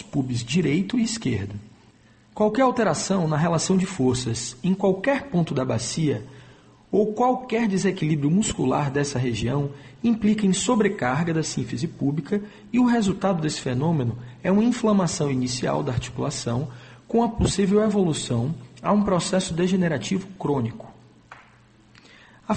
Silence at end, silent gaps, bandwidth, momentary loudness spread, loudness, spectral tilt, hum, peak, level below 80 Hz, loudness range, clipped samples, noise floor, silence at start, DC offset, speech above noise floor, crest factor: 0 s; none; 8.8 kHz; 8 LU; -23 LUFS; -5.5 dB/octave; none; -8 dBFS; -48 dBFS; 2 LU; under 0.1%; -54 dBFS; 0 s; under 0.1%; 32 dB; 16 dB